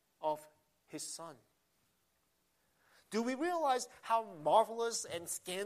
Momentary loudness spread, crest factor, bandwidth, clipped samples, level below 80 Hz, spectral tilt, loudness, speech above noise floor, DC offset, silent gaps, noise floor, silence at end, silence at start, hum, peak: 14 LU; 22 dB; 15 kHz; under 0.1%; -86 dBFS; -2.5 dB/octave; -36 LUFS; 43 dB; under 0.1%; none; -78 dBFS; 0 s; 0.2 s; none; -16 dBFS